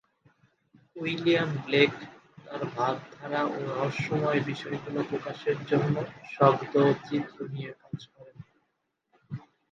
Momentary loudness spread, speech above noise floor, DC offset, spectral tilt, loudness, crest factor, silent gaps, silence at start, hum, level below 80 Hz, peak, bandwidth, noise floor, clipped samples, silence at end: 18 LU; 50 dB; under 0.1%; -7 dB/octave; -28 LUFS; 24 dB; none; 0.95 s; none; -70 dBFS; -6 dBFS; 7.6 kHz; -78 dBFS; under 0.1%; 0.3 s